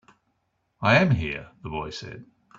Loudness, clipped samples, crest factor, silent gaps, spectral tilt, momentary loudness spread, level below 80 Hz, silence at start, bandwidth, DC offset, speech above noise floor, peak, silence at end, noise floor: -24 LUFS; under 0.1%; 22 dB; none; -6.5 dB/octave; 20 LU; -50 dBFS; 0.8 s; 7.6 kHz; under 0.1%; 49 dB; -4 dBFS; 0.35 s; -74 dBFS